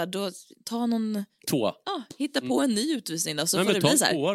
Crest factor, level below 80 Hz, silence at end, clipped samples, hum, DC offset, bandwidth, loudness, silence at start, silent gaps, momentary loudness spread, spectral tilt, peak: 22 dB; -72 dBFS; 0 s; under 0.1%; none; under 0.1%; 16.5 kHz; -26 LUFS; 0 s; none; 13 LU; -3.5 dB/octave; -6 dBFS